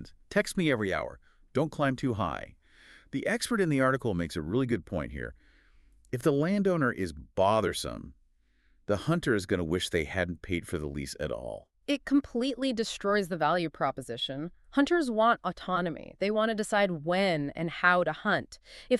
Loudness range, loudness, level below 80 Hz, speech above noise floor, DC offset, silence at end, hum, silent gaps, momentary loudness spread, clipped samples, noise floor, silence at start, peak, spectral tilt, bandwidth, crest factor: 3 LU; -30 LUFS; -52 dBFS; 37 dB; under 0.1%; 0 s; none; none; 11 LU; under 0.1%; -66 dBFS; 0 s; -8 dBFS; -5.5 dB/octave; 13.5 kHz; 22 dB